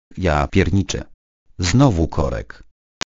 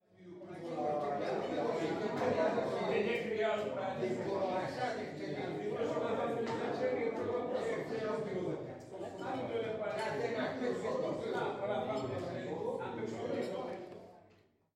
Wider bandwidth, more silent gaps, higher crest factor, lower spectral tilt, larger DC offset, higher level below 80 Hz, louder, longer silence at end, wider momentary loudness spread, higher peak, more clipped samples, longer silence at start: second, 8 kHz vs 12.5 kHz; first, 1.14-1.46 s vs none; about the same, 20 dB vs 16 dB; about the same, -6 dB/octave vs -6 dB/octave; first, 0.1% vs under 0.1%; first, -30 dBFS vs -74 dBFS; first, -19 LUFS vs -37 LUFS; about the same, 0.5 s vs 0.55 s; first, 12 LU vs 8 LU; first, 0 dBFS vs -20 dBFS; neither; about the same, 0.15 s vs 0.2 s